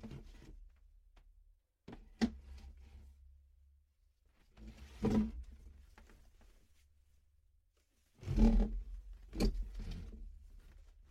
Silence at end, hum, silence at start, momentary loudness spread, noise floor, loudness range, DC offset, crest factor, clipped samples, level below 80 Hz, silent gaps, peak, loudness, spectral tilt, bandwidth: 0.25 s; none; 0 s; 27 LU; -75 dBFS; 8 LU; under 0.1%; 24 dB; under 0.1%; -44 dBFS; none; -16 dBFS; -38 LUFS; -7.5 dB/octave; 10.5 kHz